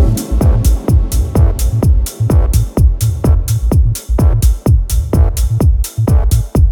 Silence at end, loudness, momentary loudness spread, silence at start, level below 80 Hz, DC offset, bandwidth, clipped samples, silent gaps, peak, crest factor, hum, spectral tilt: 0 s; -13 LUFS; 2 LU; 0 s; -12 dBFS; under 0.1%; 18 kHz; under 0.1%; none; 0 dBFS; 10 dB; none; -7 dB/octave